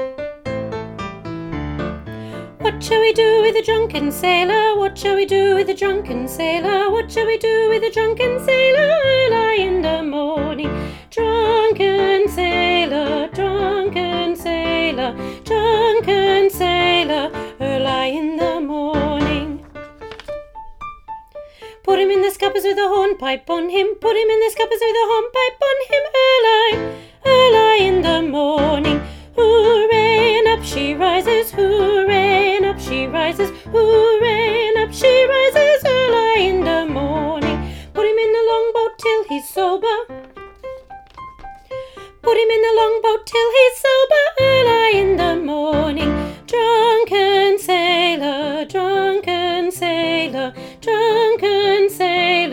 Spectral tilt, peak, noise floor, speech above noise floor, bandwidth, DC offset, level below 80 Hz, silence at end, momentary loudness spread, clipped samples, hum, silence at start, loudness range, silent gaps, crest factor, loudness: -4.5 dB/octave; 0 dBFS; -37 dBFS; 22 dB; 17 kHz; under 0.1%; -40 dBFS; 0 s; 14 LU; under 0.1%; none; 0 s; 6 LU; none; 16 dB; -16 LUFS